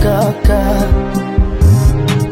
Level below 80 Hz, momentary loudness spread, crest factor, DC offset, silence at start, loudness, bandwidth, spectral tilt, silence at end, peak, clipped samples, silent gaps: -14 dBFS; 5 LU; 10 dB; under 0.1%; 0 s; -13 LUFS; 16.5 kHz; -7 dB/octave; 0 s; 0 dBFS; under 0.1%; none